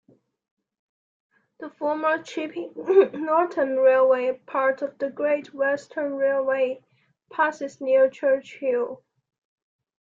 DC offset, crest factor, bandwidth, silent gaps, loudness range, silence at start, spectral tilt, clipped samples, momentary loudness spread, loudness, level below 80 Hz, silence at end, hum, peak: under 0.1%; 18 dB; 7.6 kHz; none; 4 LU; 1.6 s; -5 dB/octave; under 0.1%; 13 LU; -23 LUFS; -76 dBFS; 1.05 s; none; -6 dBFS